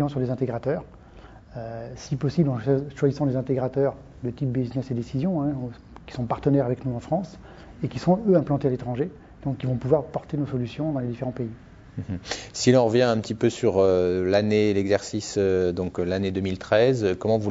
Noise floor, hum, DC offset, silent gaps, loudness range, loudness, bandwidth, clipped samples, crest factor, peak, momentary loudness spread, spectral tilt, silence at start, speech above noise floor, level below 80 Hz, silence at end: -47 dBFS; none; under 0.1%; none; 6 LU; -25 LUFS; 8 kHz; under 0.1%; 20 dB; -4 dBFS; 14 LU; -6.5 dB/octave; 0 s; 23 dB; -50 dBFS; 0 s